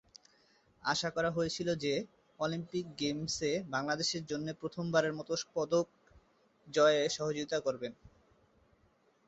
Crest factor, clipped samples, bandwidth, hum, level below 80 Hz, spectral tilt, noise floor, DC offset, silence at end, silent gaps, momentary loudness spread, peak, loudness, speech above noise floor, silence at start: 20 dB; under 0.1%; 8 kHz; none; -68 dBFS; -3.5 dB/octave; -70 dBFS; under 0.1%; 1.2 s; none; 9 LU; -16 dBFS; -34 LUFS; 37 dB; 0.85 s